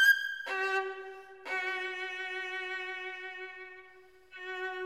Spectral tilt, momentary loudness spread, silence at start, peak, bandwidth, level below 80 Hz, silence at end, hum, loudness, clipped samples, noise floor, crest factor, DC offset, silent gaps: 0.5 dB/octave; 15 LU; 0 s; -14 dBFS; 16 kHz; -80 dBFS; 0 s; none; -34 LUFS; under 0.1%; -58 dBFS; 20 dB; under 0.1%; none